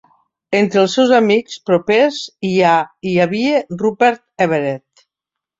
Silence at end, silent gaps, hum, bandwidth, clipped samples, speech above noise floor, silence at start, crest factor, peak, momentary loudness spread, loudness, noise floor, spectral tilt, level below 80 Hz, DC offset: 0.8 s; none; none; 7.8 kHz; under 0.1%; 69 dB; 0.5 s; 14 dB; -2 dBFS; 7 LU; -15 LUFS; -84 dBFS; -5.5 dB/octave; -60 dBFS; under 0.1%